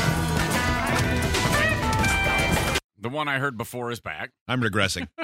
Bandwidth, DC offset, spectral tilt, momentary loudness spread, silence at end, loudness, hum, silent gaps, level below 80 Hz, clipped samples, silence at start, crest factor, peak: 16 kHz; under 0.1%; -4 dB/octave; 10 LU; 0 s; -24 LUFS; none; 2.84-2.89 s, 4.41-4.46 s; -36 dBFS; under 0.1%; 0 s; 20 dB; -6 dBFS